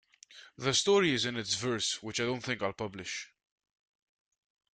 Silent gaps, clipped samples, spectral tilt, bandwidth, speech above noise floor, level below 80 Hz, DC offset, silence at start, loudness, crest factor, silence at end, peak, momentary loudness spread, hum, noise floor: none; under 0.1%; -3 dB/octave; 9.6 kHz; 24 dB; -70 dBFS; under 0.1%; 0.3 s; -31 LUFS; 18 dB; 1.5 s; -16 dBFS; 13 LU; none; -56 dBFS